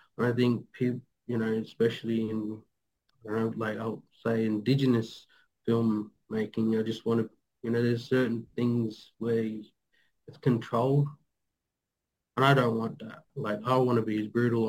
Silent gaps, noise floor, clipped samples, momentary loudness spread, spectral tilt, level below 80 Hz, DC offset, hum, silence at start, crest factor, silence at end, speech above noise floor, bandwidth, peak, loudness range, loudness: none; -87 dBFS; under 0.1%; 13 LU; -8 dB/octave; -72 dBFS; under 0.1%; none; 0.2 s; 20 dB; 0 s; 59 dB; 16 kHz; -10 dBFS; 3 LU; -29 LUFS